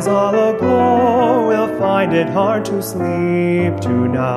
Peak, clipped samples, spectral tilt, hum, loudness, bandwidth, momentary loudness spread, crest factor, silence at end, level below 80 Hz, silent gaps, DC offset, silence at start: -2 dBFS; under 0.1%; -7 dB/octave; none; -15 LUFS; 14 kHz; 5 LU; 12 dB; 0 s; -50 dBFS; none; under 0.1%; 0 s